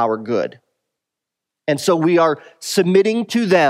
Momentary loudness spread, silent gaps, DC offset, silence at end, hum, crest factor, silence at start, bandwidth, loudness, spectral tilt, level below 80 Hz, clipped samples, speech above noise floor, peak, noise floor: 10 LU; none; under 0.1%; 0 s; none; 16 dB; 0 s; 16 kHz; -17 LUFS; -5 dB/octave; -72 dBFS; under 0.1%; 67 dB; -2 dBFS; -83 dBFS